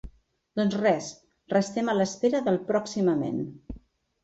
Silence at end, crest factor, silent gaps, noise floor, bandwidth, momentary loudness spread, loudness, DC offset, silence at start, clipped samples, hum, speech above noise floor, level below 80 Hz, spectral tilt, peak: 0.45 s; 18 dB; none; -56 dBFS; 8 kHz; 15 LU; -27 LUFS; under 0.1%; 0.05 s; under 0.1%; none; 30 dB; -54 dBFS; -6 dB/octave; -10 dBFS